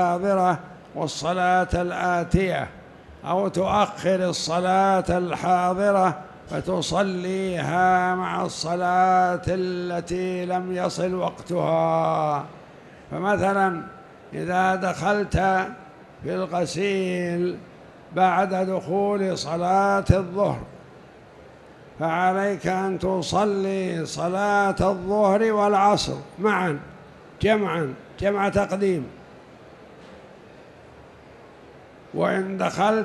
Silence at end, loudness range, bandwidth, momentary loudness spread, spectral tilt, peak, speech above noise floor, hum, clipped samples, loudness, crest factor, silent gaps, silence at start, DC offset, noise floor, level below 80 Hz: 0 s; 4 LU; 12 kHz; 10 LU; -5.5 dB/octave; -2 dBFS; 24 dB; none; under 0.1%; -23 LUFS; 22 dB; none; 0 s; under 0.1%; -47 dBFS; -46 dBFS